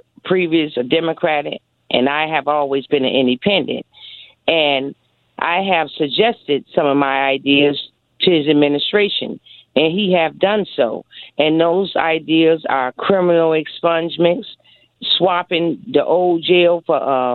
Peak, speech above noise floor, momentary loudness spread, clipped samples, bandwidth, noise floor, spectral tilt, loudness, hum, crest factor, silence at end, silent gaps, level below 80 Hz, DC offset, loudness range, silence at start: 0 dBFS; 24 dB; 10 LU; under 0.1%; 4.5 kHz; -40 dBFS; -9 dB/octave; -16 LUFS; none; 16 dB; 0 s; none; -62 dBFS; under 0.1%; 2 LU; 0.25 s